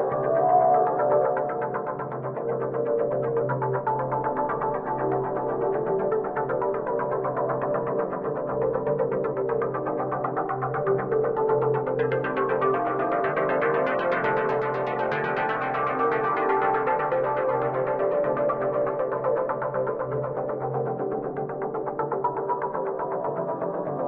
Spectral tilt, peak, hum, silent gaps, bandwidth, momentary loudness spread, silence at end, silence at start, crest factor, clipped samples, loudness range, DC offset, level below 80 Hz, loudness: -9.5 dB/octave; -10 dBFS; none; none; 5 kHz; 6 LU; 0 s; 0 s; 16 dB; under 0.1%; 4 LU; under 0.1%; -58 dBFS; -26 LUFS